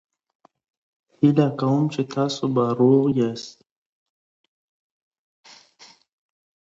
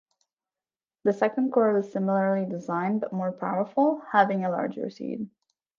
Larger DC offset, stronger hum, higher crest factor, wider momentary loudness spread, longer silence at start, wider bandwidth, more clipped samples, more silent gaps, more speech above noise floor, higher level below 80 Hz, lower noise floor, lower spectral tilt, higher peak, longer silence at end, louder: neither; neither; about the same, 20 dB vs 22 dB; second, 8 LU vs 11 LU; first, 1.2 s vs 1.05 s; about the same, 7.8 kHz vs 7.2 kHz; neither; neither; second, 32 dB vs over 65 dB; first, -68 dBFS vs -78 dBFS; second, -52 dBFS vs under -90 dBFS; about the same, -7.5 dB/octave vs -8.5 dB/octave; about the same, -4 dBFS vs -6 dBFS; first, 3.25 s vs 0.5 s; first, -21 LUFS vs -26 LUFS